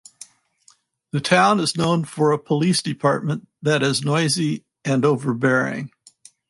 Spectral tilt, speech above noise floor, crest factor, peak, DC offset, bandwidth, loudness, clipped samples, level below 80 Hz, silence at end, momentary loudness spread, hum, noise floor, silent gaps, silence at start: -5 dB/octave; 38 dB; 18 dB; -4 dBFS; under 0.1%; 11.5 kHz; -20 LUFS; under 0.1%; -62 dBFS; 0.65 s; 10 LU; none; -58 dBFS; none; 1.15 s